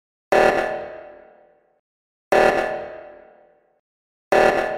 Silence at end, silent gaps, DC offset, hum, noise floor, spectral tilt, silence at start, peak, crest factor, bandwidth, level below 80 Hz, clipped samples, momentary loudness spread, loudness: 0 s; 1.79-2.31 s, 3.79-4.31 s; under 0.1%; none; -55 dBFS; -4.5 dB/octave; 0.3 s; -2 dBFS; 20 dB; 16 kHz; -50 dBFS; under 0.1%; 20 LU; -19 LUFS